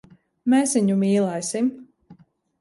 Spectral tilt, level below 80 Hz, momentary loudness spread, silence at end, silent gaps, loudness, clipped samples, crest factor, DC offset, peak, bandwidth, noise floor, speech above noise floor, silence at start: -5.5 dB/octave; -68 dBFS; 7 LU; 0.5 s; none; -21 LUFS; under 0.1%; 14 dB; under 0.1%; -8 dBFS; 11.5 kHz; -52 dBFS; 32 dB; 0.45 s